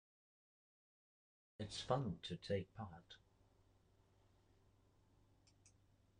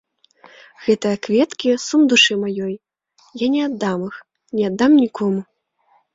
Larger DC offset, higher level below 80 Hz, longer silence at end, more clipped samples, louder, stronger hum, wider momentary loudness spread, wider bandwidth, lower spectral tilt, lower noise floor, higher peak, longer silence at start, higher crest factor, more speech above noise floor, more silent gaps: neither; second, -74 dBFS vs -62 dBFS; second, 0.5 s vs 0.7 s; neither; second, -46 LUFS vs -18 LUFS; neither; first, 20 LU vs 14 LU; first, 10 kHz vs 7.8 kHz; first, -5.5 dB/octave vs -4 dB/octave; first, -74 dBFS vs -61 dBFS; second, -24 dBFS vs -2 dBFS; first, 1.6 s vs 0.8 s; first, 26 dB vs 18 dB; second, 29 dB vs 43 dB; neither